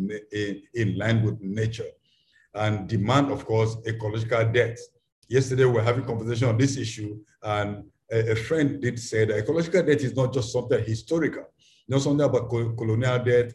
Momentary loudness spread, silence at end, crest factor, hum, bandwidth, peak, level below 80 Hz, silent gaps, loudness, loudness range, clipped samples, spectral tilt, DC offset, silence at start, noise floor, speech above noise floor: 9 LU; 0 s; 18 dB; none; 11 kHz; -6 dBFS; -52 dBFS; 5.12-5.22 s; -25 LUFS; 2 LU; under 0.1%; -6.5 dB/octave; under 0.1%; 0 s; -63 dBFS; 39 dB